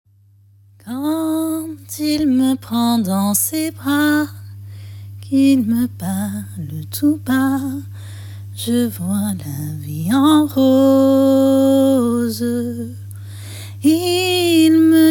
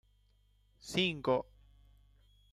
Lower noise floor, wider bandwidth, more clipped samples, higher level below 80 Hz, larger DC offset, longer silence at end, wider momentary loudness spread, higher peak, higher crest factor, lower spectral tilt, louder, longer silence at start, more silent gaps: second, -51 dBFS vs -69 dBFS; first, 18.5 kHz vs 14.5 kHz; neither; first, -58 dBFS vs -64 dBFS; neither; second, 0 s vs 1.1 s; about the same, 20 LU vs 21 LU; first, -2 dBFS vs -18 dBFS; second, 14 dB vs 22 dB; about the same, -5 dB/octave vs -4.5 dB/octave; first, -16 LUFS vs -34 LUFS; about the same, 0.85 s vs 0.85 s; neither